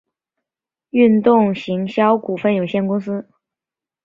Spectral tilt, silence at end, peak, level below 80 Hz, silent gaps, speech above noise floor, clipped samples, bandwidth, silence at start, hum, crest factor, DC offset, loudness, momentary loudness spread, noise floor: -8.5 dB/octave; 0.85 s; -2 dBFS; -62 dBFS; none; 73 dB; under 0.1%; 6.8 kHz; 0.95 s; none; 16 dB; under 0.1%; -17 LUFS; 9 LU; -89 dBFS